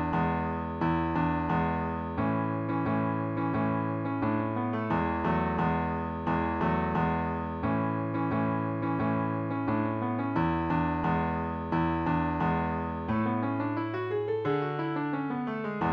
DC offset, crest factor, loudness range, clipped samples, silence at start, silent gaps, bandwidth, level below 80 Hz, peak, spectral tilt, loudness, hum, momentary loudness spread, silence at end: under 0.1%; 14 dB; 1 LU; under 0.1%; 0 s; none; 5.4 kHz; -50 dBFS; -14 dBFS; -10 dB/octave; -30 LUFS; none; 4 LU; 0 s